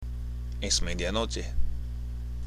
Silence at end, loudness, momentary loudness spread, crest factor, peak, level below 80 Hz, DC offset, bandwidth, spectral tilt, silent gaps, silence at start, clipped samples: 0 s; -32 LUFS; 10 LU; 18 dB; -12 dBFS; -32 dBFS; under 0.1%; 12.5 kHz; -3.5 dB/octave; none; 0 s; under 0.1%